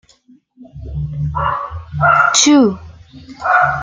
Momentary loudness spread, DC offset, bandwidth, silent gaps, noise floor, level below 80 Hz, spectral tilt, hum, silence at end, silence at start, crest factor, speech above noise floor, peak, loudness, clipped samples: 18 LU; under 0.1%; 9.6 kHz; none; -50 dBFS; -36 dBFS; -3.5 dB/octave; none; 0 s; 0.6 s; 16 dB; 37 dB; 0 dBFS; -13 LUFS; under 0.1%